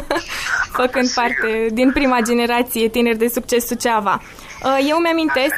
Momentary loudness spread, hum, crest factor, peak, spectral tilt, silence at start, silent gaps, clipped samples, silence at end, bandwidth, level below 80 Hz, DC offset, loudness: 5 LU; none; 14 dB; -4 dBFS; -3 dB/octave; 0 s; none; under 0.1%; 0 s; 15.5 kHz; -42 dBFS; under 0.1%; -17 LUFS